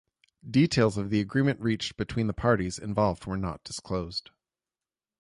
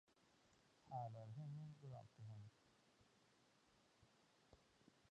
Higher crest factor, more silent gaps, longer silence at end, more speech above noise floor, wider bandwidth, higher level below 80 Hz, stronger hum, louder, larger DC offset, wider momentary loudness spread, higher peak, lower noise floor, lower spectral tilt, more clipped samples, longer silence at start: about the same, 20 dB vs 20 dB; neither; first, 1 s vs 0 s; first, over 63 dB vs 21 dB; first, 11.5 kHz vs 9.4 kHz; first, -50 dBFS vs -86 dBFS; neither; first, -28 LUFS vs -57 LUFS; neither; about the same, 9 LU vs 8 LU; first, -10 dBFS vs -40 dBFS; first, under -90 dBFS vs -78 dBFS; second, -6 dB/octave vs -7.5 dB/octave; neither; first, 0.45 s vs 0.1 s